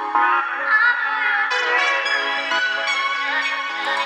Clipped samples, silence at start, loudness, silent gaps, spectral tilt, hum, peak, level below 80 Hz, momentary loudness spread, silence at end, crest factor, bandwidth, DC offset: under 0.1%; 0 s; -18 LUFS; none; 1 dB/octave; none; -4 dBFS; -82 dBFS; 4 LU; 0 s; 16 dB; 11.5 kHz; under 0.1%